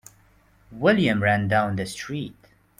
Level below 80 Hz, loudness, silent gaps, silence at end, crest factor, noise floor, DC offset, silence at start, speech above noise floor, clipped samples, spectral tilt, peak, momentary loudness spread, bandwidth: -56 dBFS; -23 LUFS; none; 0.45 s; 20 dB; -58 dBFS; under 0.1%; 0.7 s; 35 dB; under 0.1%; -6 dB/octave; -6 dBFS; 13 LU; 15.5 kHz